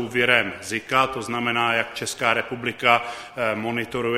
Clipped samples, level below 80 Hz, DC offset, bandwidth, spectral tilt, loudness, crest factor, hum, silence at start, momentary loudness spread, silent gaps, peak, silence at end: under 0.1%; -58 dBFS; under 0.1%; 16 kHz; -3.5 dB/octave; -22 LUFS; 22 dB; none; 0 s; 8 LU; none; 0 dBFS; 0 s